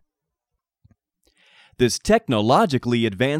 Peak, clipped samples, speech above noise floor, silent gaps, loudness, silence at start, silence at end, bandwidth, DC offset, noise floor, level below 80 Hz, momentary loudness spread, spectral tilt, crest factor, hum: -4 dBFS; under 0.1%; 63 dB; none; -20 LUFS; 1.8 s; 0 s; 15.5 kHz; under 0.1%; -82 dBFS; -48 dBFS; 4 LU; -5 dB/octave; 18 dB; none